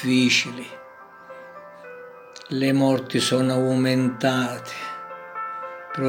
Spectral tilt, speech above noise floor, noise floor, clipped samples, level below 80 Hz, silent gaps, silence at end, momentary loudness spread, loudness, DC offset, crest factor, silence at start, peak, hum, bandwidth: -5 dB/octave; 23 dB; -45 dBFS; under 0.1%; -74 dBFS; none; 0 s; 22 LU; -22 LUFS; under 0.1%; 18 dB; 0 s; -6 dBFS; none; 16.5 kHz